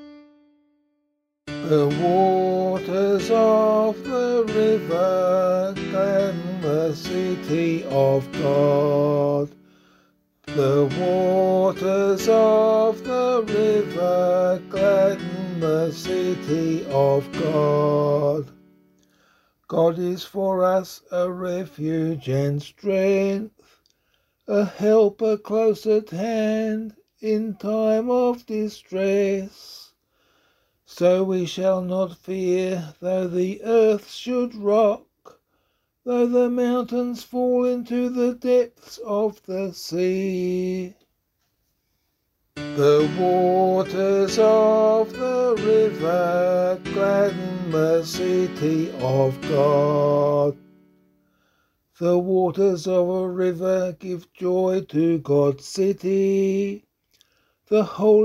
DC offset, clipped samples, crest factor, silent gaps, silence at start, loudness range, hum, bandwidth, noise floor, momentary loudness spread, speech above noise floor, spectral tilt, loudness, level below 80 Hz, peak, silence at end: under 0.1%; under 0.1%; 16 dB; none; 0 s; 5 LU; none; 15 kHz; -73 dBFS; 9 LU; 53 dB; -7 dB/octave; -21 LUFS; -60 dBFS; -6 dBFS; 0 s